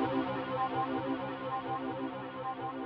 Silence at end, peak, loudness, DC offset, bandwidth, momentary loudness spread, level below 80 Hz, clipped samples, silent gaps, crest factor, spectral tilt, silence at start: 0 s; -20 dBFS; -36 LUFS; under 0.1%; 5.6 kHz; 6 LU; -66 dBFS; under 0.1%; none; 14 dB; -4.5 dB/octave; 0 s